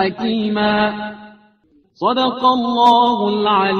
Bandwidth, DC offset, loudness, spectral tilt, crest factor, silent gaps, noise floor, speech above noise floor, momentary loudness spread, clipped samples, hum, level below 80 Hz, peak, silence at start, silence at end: 8 kHz; under 0.1%; -16 LUFS; -6 dB/octave; 16 dB; none; -56 dBFS; 40 dB; 9 LU; under 0.1%; none; -54 dBFS; 0 dBFS; 0 s; 0 s